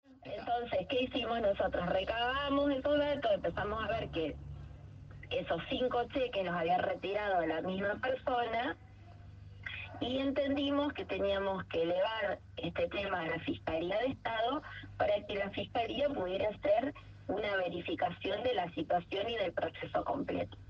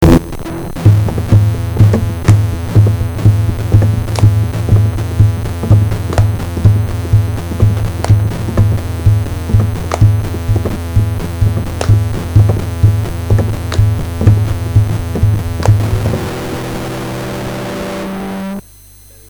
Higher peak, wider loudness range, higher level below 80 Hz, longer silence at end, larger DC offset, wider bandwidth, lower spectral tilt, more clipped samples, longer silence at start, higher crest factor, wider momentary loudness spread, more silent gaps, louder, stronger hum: second, -20 dBFS vs 0 dBFS; about the same, 3 LU vs 4 LU; second, -56 dBFS vs -22 dBFS; second, 0 s vs 0.7 s; second, under 0.1% vs 0.6%; second, 7 kHz vs 20 kHz; about the same, -7 dB/octave vs -7.5 dB/octave; second, under 0.1% vs 0.3%; about the same, 0.1 s vs 0 s; about the same, 16 dB vs 12 dB; about the same, 9 LU vs 9 LU; neither; second, -35 LUFS vs -13 LUFS; neither